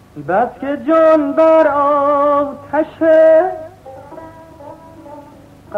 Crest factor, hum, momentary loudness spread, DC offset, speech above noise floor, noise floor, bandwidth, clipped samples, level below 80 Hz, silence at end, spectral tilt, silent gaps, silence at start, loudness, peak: 12 dB; none; 20 LU; under 0.1%; 28 dB; -40 dBFS; 5.6 kHz; under 0.1%; -52 dBFS; 0 s; -7.5 dB/octave; none; 0.15 s; -13 LUFS; -2 dBFS